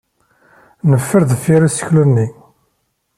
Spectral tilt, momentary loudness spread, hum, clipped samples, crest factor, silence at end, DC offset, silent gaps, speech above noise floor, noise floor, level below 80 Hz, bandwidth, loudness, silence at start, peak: -7 dB/octave; 5 LU; none; under 0.1%; 14 dB; 0.85 s; under 0.1%; none; 54 dB; -66 dBFS; -52 dBFS; 14 kHz; -14 LUFS; 0.85 s; -2 dBFS